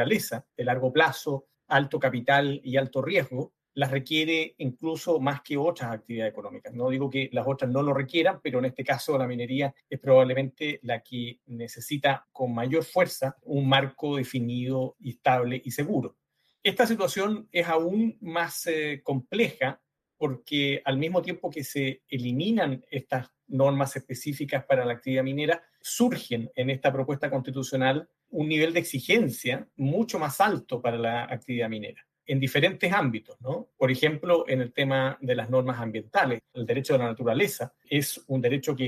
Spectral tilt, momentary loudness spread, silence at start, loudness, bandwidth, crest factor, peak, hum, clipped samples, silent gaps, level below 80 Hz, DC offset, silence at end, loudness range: -5.5 dB/octave; 10 LU; 0 s; -27 LUFS; 14.5 kHz; 20 dB; -6 dBFS; none; under 0.1%; none; -70 dBFS; under 0.1%; 0 s; 3 LU